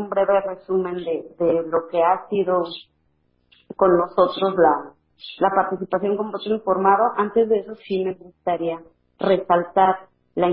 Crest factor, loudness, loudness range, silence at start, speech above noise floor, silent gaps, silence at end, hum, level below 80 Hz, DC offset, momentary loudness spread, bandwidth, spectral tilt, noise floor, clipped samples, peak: 18 dB; -21 LUFS; 2 LU; 0 s; 46 dB; none; 0 s; none; -60 dBFS; under 0.1%; 11 LU; 5.2 kHz; -11 dB/octave; -66 dBFS; under 0.1%; -4 dBFS